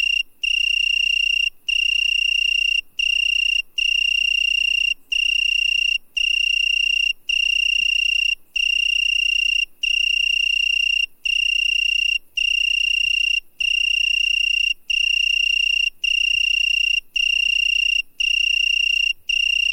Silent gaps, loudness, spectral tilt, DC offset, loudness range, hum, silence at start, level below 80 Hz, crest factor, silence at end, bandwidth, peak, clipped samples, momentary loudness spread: none; -17 LUFS; 4 dB/octave; under 0.1%; 1 LU; none; 0 s; -46 dBFS; 8 dB; 0 s; 16.5 kHz; -12 dBFS; under 0.1%; 3 LU